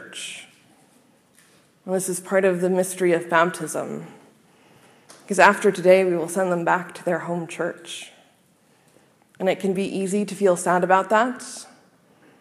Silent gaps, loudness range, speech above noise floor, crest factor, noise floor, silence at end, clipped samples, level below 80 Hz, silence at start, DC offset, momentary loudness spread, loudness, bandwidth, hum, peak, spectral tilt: none; 7 LU; 38 dB; 24 dB; -60 dBFS; 0.75 s; under 0.1%; -74 dBFS; 0 s; under 0.1%; 18 LU; -21 LUFS; 15.5 kHz; none; 0 dBFS; -4.5 dB/octave